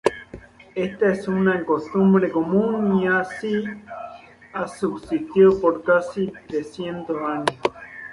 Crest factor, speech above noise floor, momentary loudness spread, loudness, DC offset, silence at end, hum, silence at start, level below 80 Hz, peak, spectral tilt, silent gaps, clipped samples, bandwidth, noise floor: 20 dB; 22 dB; 17 LU; -22 LUFS; under 0.1%; 0 s; none; 0.05 s; -56 dBFS; 0 dBFS; -7 dB/octave; none; under 0.1%; 11.5 kHz; -43 dBFS